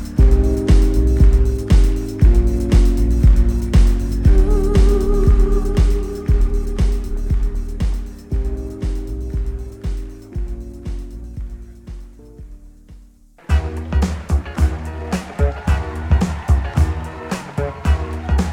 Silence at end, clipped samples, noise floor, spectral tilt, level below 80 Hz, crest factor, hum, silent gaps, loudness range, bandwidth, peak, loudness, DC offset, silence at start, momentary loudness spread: 0 s; under 0.1%; -45 dBFS; -7.5 dB/octave; -16 dBFS; 16 dB; none; none; 13 LU; 10.5 kHz; 0 dBFS; -19 LUFS; under 0.1%; 0 s; 15 LU